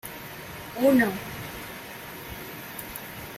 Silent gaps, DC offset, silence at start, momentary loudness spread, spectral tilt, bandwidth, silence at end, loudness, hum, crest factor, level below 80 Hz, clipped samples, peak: none; under 0.1%; 0.05 s; 17 LU; -5 dB/octave; 16.5 kHz; 0 s; -29 LUFS; none; 20 dB; -54 dBFS; under 0.1%; -10 dBFS